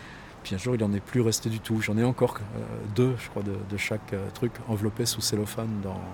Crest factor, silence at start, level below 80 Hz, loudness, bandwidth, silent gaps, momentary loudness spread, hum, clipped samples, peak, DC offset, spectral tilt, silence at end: 20 dB; 0 s; -54 dBFS; -28 LUFS; 18 kHz; none; 9 LU; none; under 0.1%; -10 dBFS; under 0.1%; -5 dB/octave; 0 s